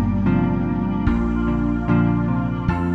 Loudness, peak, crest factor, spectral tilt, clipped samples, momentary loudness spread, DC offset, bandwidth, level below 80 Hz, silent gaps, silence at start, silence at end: -20 LUFS; -6 dBFS; 14 dB; -10 dB/octave; under 0.1%; 3 LU; under 0.1%; 6 kHz; -28 dBFS; none; 0 s; 0 s